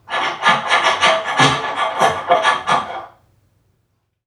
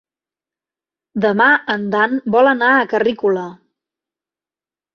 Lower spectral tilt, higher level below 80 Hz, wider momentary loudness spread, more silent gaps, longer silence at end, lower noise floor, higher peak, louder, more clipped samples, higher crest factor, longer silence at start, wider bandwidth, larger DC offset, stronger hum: second, -2.5 dB/octave vs -7 dB/octave; first, -56 dBFS vs -64 dBFS; about the same, 7 LU vs 9 LU; neither; second, 1.2 s vs 1.4 s; second, -67 dBFS vs under -90 dBFS; about the same, 0 dBFS vs -2 dBFS; about the same, -15 LUFS vs -15 LUFS; neither; about the same, 18 dB vs 16 dB; second, 0.1 s vs 1.15 s; first, 14 kHz vs 6.8 kHz; neither; neither